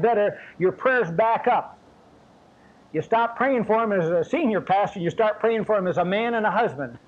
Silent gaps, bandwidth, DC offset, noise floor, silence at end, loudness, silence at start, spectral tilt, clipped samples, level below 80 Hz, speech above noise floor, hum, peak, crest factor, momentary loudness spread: none; 8 kHz; under 0.1%; -53 dBFS; 0.1 s; -23 LUFS; 0 s; -7 dB/octave; under 0.1%; -62 dBFS; 31 dB; none; -10 dBFS; 14 dB; 5 LU